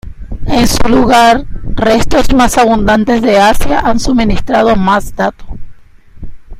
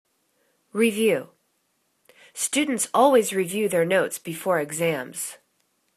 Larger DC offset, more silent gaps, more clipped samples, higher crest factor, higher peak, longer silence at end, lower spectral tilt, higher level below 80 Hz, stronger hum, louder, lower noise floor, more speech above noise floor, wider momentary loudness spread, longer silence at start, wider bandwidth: neither; neither; first, 0.3% vs under 0.1%; second, 10 dB vs 20 dB; first, 0 dBFS vs -4 dBFS; second, 0 s vs 0.6 s; first, -5 dB/octave vs -3.5 dB/octave; first, -20 dBFS vs -72 dBFS; neither; first, -10 LUFS vs -23 LUFS; second, -35 dBFS vs -71 dBFS; second, 27 dB vs 48 dB; second, 9 LU vs 13 LU; second, 0.05 s vs 0.75 s; first, 15.5 kHz vs 14 kHz